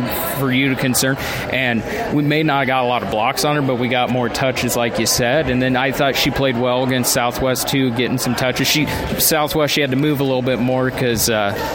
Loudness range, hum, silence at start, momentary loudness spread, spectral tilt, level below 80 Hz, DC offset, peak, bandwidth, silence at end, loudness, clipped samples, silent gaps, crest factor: 1 LU; none; 0 s; 3 LU; -4 dB/octave; -40 dBFS; under 0.1%; -2 dBFS; 17 kHz; 0 s; -17 LUFS; under 0.1%; none; 14 dB